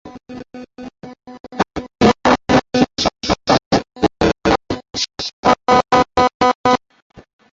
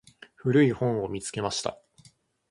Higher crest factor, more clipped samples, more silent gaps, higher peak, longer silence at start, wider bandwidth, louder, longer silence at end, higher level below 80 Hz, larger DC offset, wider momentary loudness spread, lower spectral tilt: about the same, 16 dB vs 18 dB; neither; first, 1.40-1.44 s, 3.66-3.71 s, 5.33-5.43 s, 6.34-6.40 s, 6.55-6.64 s, 7.02-7.10 s vs none; first, 0 dBFS vs -10 dBFS; second, 0.05 s vs 0.45 s; second, 7.8 kHz vs 11.5 kHz; first, -16 LUFS vs -27 LUFS; second, 0.35 s vs 0.75 s; first, -38 dBFS vs -58 dBFS; neither; first, 21 LU vs 10 LU; about the same, -4.5 dB/octave vs -5.5 dB/octave